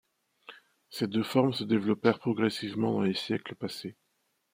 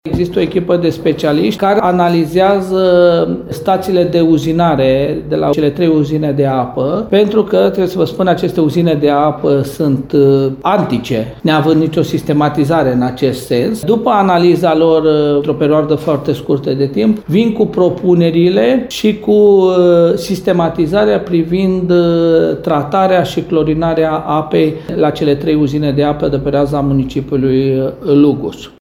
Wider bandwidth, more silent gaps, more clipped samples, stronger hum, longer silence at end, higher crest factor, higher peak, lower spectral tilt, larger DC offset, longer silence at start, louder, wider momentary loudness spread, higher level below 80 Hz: second, 16 kHz vs 18.5 kHz; neither; neither; neither; first, 0.6 s vs 0.15 s; first, 20 dB vs 12 dB; second, -10 dBFS vs 0 dBFS; about the same, -6.5 dB/octave vs -7.5 dB/octave; neither; first, 0.5 s vs 0.05 s; second, -30 LUFS vs -12 LUFS; first, 11 LU vs 6 LU; second, -74 dBFS vs -40 dBFS